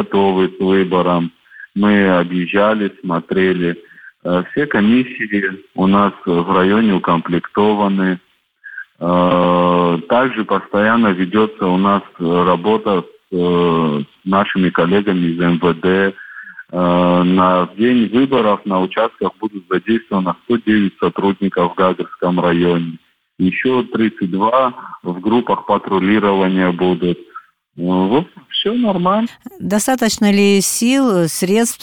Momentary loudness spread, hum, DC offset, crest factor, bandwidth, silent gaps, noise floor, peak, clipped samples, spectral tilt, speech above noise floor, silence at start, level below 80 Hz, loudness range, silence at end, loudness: 8 LU; none; under 0.1%; 14 dB; 18 kHz; none; -40 dBFS; -2 dBFS; under 0.1%; -5.5 dB/octave; 25 dB; 0 s; -52 dBFS; 2 LU; 0.05 s; -15 LUFS